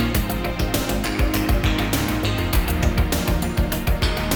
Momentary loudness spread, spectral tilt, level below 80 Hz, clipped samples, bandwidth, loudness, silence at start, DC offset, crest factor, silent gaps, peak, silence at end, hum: 2 LU; -5 dB/octave; -24 dBFS; under 0.1%; over 20 kHz; -22 LUFS; 0 s; under 0.1%; 14 dB; none; -6 dBFS; 0 s; none